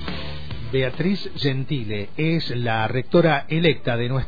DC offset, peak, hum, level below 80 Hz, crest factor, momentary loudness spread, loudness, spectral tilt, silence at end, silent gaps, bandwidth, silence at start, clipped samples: 4%; -6 dBFS; none; -42 dBFS; 18 dB; 11 LU; -22 LUFS; -8.5 dB/octave; 0 s; none; 5 kHz; 0 s; under 0.1%